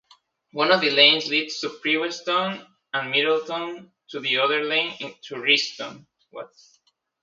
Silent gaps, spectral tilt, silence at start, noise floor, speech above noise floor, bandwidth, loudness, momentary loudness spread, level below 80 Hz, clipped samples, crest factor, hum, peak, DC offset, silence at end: none; -2.5 dB/octave; 0.55 s; -59 dBFS; 36 dB; 7.8 kHz; -21 LUFS; 22 LU; -78 dBFS; under 0.1%; 24 dB; none; -2 dBFS; under 0.1%; 0.75 s